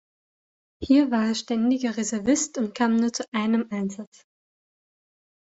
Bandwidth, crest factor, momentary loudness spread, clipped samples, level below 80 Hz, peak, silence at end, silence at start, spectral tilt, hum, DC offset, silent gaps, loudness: 8.2 kHz; 18 dB; 10 LU; under 0.1%; -60 dBFS; -8 dBFS; 1.55 s; 0.8 s; -4 dB/octave; none; under 0.1%; 3.28-3.32 s; -24 LUFS